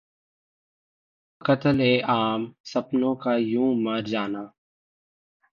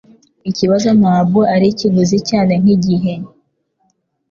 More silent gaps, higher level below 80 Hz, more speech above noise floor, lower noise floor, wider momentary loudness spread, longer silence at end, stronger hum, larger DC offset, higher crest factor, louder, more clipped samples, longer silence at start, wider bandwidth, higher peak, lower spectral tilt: first, 2.60-2.64 s vs none; second, -64 dBFS vs -50 dBFS; first, over 66 dB vs 51 dB; first, under -90 dBFS vs -63 dBFS; about the same, 10 LU vs 12 LU; about the same, 1.05 s vs 1.05 s; neither; neither; first, 18 dB vs 12 dB; second, -24 LUFS vs -13 LUFS; neither; first, 1.45 s vs 0.45 s; about the same, 7.2 kHz vs 7.2 kHz; second, -8 dBFS vs -2 dBFS; about the same, -7 dB/octave vs -7 dB/octave